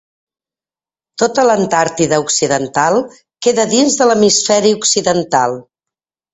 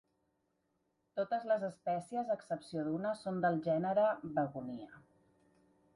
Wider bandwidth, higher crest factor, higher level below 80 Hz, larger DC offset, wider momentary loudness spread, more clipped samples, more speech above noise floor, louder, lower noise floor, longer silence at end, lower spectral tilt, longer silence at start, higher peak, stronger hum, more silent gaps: second, 8.4 kHz vs 11 kHz; about the same, 14 dB vs 16 dB; first, -54 dBFS vs -78 dBFS; neither; second, 7 LU vs 12 LU; neither; first, over 77 dB vs 45 dB; first, -13 LUFS vs -36 LUFS; first, under -90 dBFS vs -81 dBFS; second, 0.7 s vs 0.95 s; second, -3 dB/octave vs -7.5 dB/octave; about the same, 1.2 s vs 1.15 s; first, 0 dBFS vs -22 dBFS; neither; neither